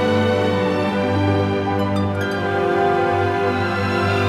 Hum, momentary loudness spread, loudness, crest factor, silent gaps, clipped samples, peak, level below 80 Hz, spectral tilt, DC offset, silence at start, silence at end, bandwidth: none; 3 LU; -19 LUFS; 12 dB; none; under 0.1%; -6 dBFS; -52 dBFS; -7 dB/octave; under 0.1%; 0 s; 0 s; 12.5 kHz